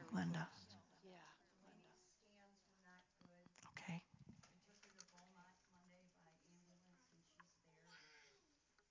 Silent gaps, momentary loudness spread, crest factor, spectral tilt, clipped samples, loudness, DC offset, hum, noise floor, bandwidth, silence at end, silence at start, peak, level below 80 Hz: none; 22 LU; 24 dB; -5.5 dB/octave; under 0.1%; -53 LUFS; under 0.1%; none; -81 dBFS; 7.6 kHz; 0.55 s; 0 s; -34 dBFS; -86 dBFS